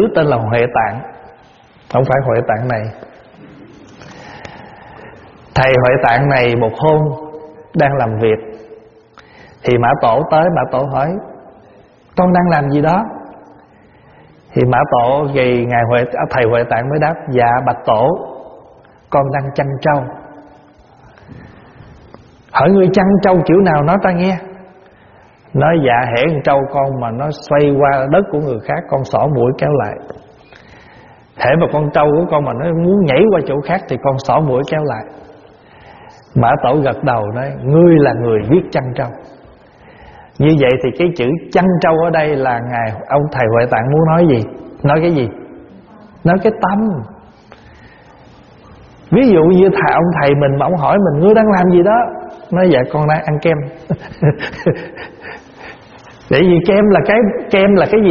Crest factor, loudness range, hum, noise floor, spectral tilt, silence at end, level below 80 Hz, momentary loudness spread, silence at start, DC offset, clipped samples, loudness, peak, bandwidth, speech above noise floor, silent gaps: 14 dB; 6 LU; none; -45 dBFS; -6.5 dB/octave; 0 s; -42 dBFS; 13 LU; 0 s; under 0.1%; under 0.1%; -13 LUFS; 0 dBFS; 7 kHz; 32 dB; none